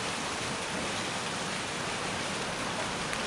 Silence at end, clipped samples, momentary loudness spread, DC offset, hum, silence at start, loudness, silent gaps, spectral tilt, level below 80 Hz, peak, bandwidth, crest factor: 0 s; under 0.1%; 1 LU; under 0.1%; none; 0 s; -32 LUFS; none; -2.5 dB/octave; -58 dBFS; -14 dBFS; 11.5 kHz; 20 dB